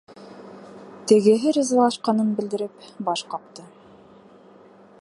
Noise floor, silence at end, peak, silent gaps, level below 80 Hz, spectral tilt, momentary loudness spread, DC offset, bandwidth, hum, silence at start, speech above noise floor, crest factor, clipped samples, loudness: -49 dBFS; 1.4 s; -2 dBFS; none; -74 dBFS; -5 dB/octave; 25 LU; under 0.1%; 11.5 kHz; none; 0.2 s; 29 dB; 20 dB; under 0.1%; -21 LUFS